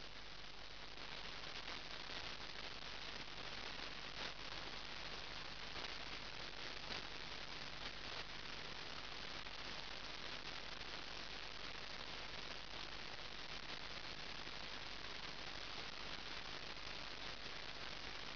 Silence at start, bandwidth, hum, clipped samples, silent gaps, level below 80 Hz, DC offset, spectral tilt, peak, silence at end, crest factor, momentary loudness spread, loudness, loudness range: 0 s; 5.4 kHz; none; under 0.1%; none; -64 dBFS; 0.2%; -0.5 dB/octave; -30 dBFS; 0 s; 20 dB; 2 LU; -48 LUFS; 1 LU